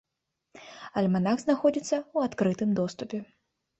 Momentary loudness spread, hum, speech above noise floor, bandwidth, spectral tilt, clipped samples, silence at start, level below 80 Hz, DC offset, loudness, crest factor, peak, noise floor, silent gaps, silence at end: 12 LU; none; 56 dB; 8.2 kHz; -6.5 dB/octave; under 0.1%; 0.55 s; -66 dBFS; under 0.1%; -28 LUFS; 18 dB; -12 dBFS; -83 dBFS; none; 0.55 s